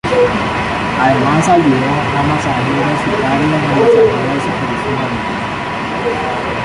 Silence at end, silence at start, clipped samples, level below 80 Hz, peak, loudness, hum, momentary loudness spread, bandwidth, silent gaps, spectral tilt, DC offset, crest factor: 0 s; 0.05 s; under 0.1%; -36 dBFS; -2 dBFS; -14 LUFS; none; 7 LU; 11.5 kHz; none; -6 dB/octave; under 0.1%; 12 dB